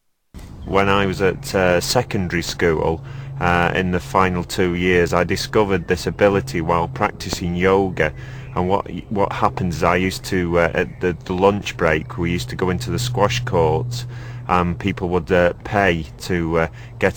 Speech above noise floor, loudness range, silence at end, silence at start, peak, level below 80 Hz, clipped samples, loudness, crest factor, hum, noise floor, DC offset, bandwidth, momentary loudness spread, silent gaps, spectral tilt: 21 dB; 2 LU; 0 s; 0.35 s; 0 dBFS; -38 dBFS; under 0.1%; -19 LUFS; 18 dB; none; -40 dBFS; under 0.1%; 19 kHz; 7 LU; none; -5.5 dB/octave